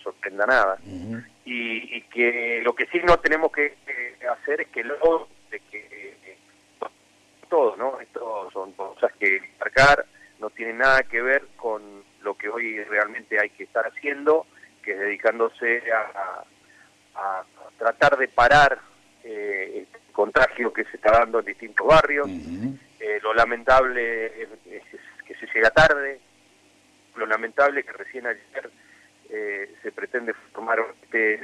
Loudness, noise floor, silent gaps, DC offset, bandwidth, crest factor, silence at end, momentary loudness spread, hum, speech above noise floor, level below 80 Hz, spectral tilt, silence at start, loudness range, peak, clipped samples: -22 LUFS; -58 dBFS; none; under 0.1%; 11 kHz; 16 dB; 0 s; 20 LU; 50 Hz at -65 dBFS; 36 dB; -48 dBFS; -4.5 dB/octave; 0.05 s; 7 LU; -6 dBFS; under 0.1%